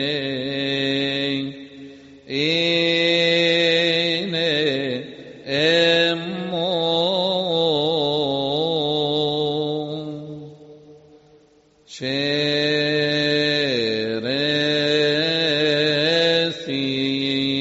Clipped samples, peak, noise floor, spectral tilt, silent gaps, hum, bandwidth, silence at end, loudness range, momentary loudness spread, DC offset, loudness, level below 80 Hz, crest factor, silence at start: under 0.1%; -6 dBFS; -55 dBFS; -2.5 dB/octave; none; none; 8 kHz; 0 s; 6 LU; 11 LU; under 0.1%; -20 LUFS; -62 dBFS; 16 dB; 0 s